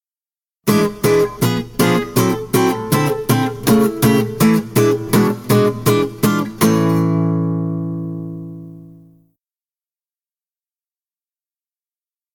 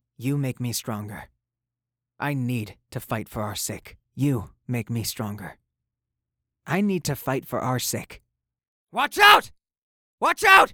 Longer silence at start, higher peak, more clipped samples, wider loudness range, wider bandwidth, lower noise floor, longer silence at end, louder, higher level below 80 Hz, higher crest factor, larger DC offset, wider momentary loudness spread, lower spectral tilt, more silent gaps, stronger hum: first, 0.65 s vs 0.2 s; about the same, -2 dBFS vs 0 dBFS; neither; about the same, 11 LU vs 9 LU; about the same, over 20 kHz vs over 20 kHz; about the same, under -90 dBFS vs -88 dBFS; first, 3.45 s vs 0 s; first, -16 LUFS vs -23 LUFS; first, -46 dBFS vs -56 dBFS; second, 16 dB vs 26 dB; neither; second, 9 LU vs 22 LU; first, -6 dB/octave vs -4 dB/octave; second, none vs 8.68-8.87 s, 9.78-10.18 s; neither